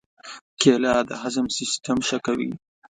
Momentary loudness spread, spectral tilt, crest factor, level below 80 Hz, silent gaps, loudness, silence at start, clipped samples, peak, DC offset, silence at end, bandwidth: 21 LU; -3.5 dB/octave; 22 dB; -56 dBFS; 0.41-0.57 s; -23 LUFS; 0.25 s; under 0.1%; -2 dBFS; under 0.1%; 0.4 s; 9.6 kHz